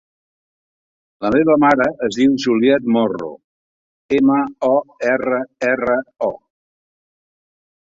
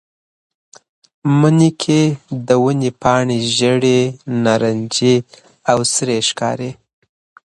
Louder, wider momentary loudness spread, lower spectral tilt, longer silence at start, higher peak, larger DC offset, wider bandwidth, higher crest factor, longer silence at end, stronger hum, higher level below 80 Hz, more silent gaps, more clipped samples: about the same, -17 LUFS vs -15 LUFS; about the same, 10 LU vs 8 LU; about the same, -6 dB/octave vs -5 dB/octave; about the same, 1.2 s vs 1.25 s; about the same, -2 dBFS vs 0 dBFS; neither; second, 7.6 kHz vs 11.5 kHz; about the same, 16 dB vs 16 dB; first, 1.55 s vs 0.75 s; neither; about the same, -56 dBFS vs -54 dBFS; first, 3.44-4.09 s vs none; neither